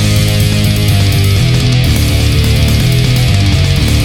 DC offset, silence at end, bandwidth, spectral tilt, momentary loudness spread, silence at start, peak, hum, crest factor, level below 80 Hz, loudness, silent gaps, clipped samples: under 0.1%; 0 s; 17.5 kHz; -5 dB/octave; 1 LU; 0 s; 0 dBFS; none; 10 dB; -18 dBFS; -10 LUFS; none; under 0.1%